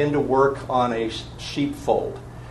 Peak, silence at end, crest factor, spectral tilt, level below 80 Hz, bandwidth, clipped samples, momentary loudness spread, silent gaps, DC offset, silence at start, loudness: -6 dBFS; 0 s; 18 dB; -6 dB/octave; -44 dBFS; 12.5 kHz; under 0.1%; 12 LU; none; under 0.1%; 0 s; -23 LUFS